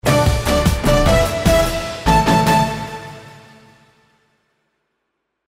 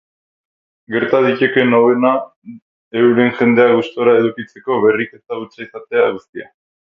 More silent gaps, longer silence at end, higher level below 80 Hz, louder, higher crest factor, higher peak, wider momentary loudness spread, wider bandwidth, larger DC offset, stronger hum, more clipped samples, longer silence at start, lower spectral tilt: second, none vs 2.36-2.42 s, 2.62-2.91 s, 6.29-6.33 s; first, 2.25 s vs 0.45 s; first, -26 dBFS vs -64 dBFS; about the same, -16 LUFS vs -14 LUFS; about the same, 14 dB vs 16 dB; second, -4 dBFS vs 0 dBFS; about the same, 16 LU vs 16 LU; first, 16 kHz vs 6 kHz; neither; neither; neither; second, 0.05 s vs 0.9 s; second, -5 dB/octave vs -8 dB/octave